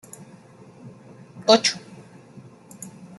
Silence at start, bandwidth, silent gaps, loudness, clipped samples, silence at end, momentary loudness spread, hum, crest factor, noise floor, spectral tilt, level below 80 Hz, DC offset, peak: 0.85 s; 12.5 kHz; none; -19 LUFS; under 0.1%; 0.3 s; 28 LU; none; 24 dB; -48 dBFS; -2.5 dB/octave; -72 dBFS; under 0.1%; -2 dBFS